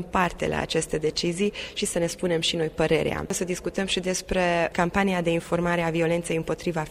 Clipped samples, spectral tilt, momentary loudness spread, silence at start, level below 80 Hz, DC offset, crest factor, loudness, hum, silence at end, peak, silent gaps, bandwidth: under 0.1%; -4.5 dB/octave; 5 LU; 0 s; -46 dBFS; under 0.1%; 18 dB; -25 LUFS; none; 0 s; -6 dBFS; none; 15.5 kHz